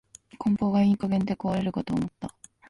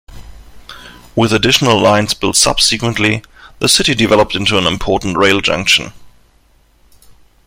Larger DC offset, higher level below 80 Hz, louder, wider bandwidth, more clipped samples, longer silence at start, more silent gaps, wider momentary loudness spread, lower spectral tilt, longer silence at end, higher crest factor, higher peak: neither; second, -54 dBFS vs -36 dBFS; second, -26 LUFS vs -12 LUFS; second, 11.5 kHz vs 16.5 kHz; neither; first, 0.4 s vs 0.1 s; neither; first, 12 LU vs 6 LU; first, -8 dB/octave vs -3 dB/octave; second, 0.4 s vs 1.4 s; about the same, 12 dB vs 14 dB; second, -14 dBFS vs 0 dBFS